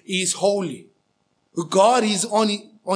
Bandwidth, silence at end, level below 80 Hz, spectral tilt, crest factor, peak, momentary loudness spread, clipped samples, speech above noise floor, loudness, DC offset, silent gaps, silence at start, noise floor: 10.5 kHz; 0 s; -80 dBFS; -3.5 dB/octave; 18 dB; -4 dBFS; 15 LU; under 0.1%; 49 dB; -20 LUFS; under 0.1%; none; 0.1 s; -69 dBFS